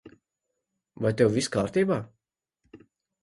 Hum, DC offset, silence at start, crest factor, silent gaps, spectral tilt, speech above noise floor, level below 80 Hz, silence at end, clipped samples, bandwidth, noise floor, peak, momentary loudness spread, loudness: none; under 0.1%; 0.05 s; 22 dB; none; -5.5 dB/octave; 58 dB; -60 dBFS; 0.45 s; under 0.1%; 11.5 kHz; -83 dBFS; -8 dBFS; 8 LU; -26 LUFS